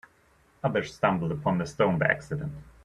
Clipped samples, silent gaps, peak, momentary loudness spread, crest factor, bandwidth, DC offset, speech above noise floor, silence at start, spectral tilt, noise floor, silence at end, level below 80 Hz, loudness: under 0.1%; none; -6 dBFS; 10 LU; 22 dB; 11 kHz; under 0.1%; 35 dB; 0.65 s; -7 dB/octave; -63 dBFS; 0.2 s; -56 dBFS; -27 LUFS